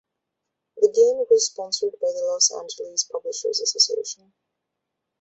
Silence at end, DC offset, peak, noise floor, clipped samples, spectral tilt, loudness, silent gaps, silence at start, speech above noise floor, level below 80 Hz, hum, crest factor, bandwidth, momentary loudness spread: 1.1 s; under 0.1%; -4 dBFS; -81 dBFS; under 0.1%; 0.5 dB/octave; -21 LUFS; none; 0.75 s; 59 dB; -76 dBFS; none; 20 dB; 8.2 kHz; 11 LU